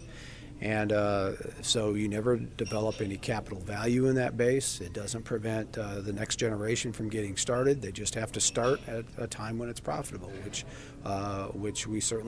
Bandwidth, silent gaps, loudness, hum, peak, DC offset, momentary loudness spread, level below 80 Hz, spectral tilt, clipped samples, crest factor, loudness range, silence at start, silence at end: 11 kHz; none; -31 LUFS; none; -12 dBFS; under 0.1%; 11 LU; -52 dBFS; -4 dB/octave; under 0.1%; 18 dB; 3 LU; 0 s; 0 s